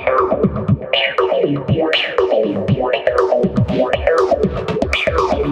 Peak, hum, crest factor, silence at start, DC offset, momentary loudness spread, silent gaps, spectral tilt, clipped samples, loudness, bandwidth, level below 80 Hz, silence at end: -2 dBFS; none; 14 dB; 0 s; under 0.1%; 3 LU; none; -6.5 dB/octave; under 0.1%; -16 LUFS; 10.5 kHz; -34 dBFS; 0 s